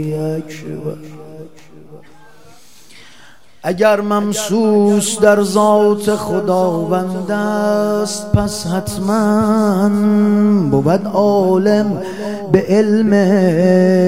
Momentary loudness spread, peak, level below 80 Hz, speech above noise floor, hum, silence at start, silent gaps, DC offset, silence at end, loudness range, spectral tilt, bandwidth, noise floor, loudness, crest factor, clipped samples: 12 LU; 0 dBFS; -44 dBFS; 32 dB; none; 0 s; none; 1%; 0 s; 8 LU; -6 dB/octave; 16 kHz; -46 dBFS; -14 LUFS; 14 dB; under 0.1%